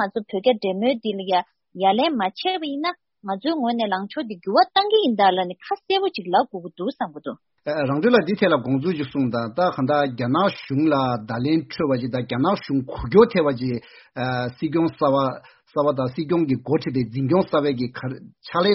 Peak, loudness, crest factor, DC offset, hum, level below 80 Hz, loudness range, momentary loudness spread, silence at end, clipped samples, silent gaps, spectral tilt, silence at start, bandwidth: -2 dBFS; -22 LUFS; 20 dB; under 0.1%; none; -54 dBFS; 2 LU; 11 LU; 0 s; under 0.1%; none; -4.5 dB/octave; 0 s; 6 kHz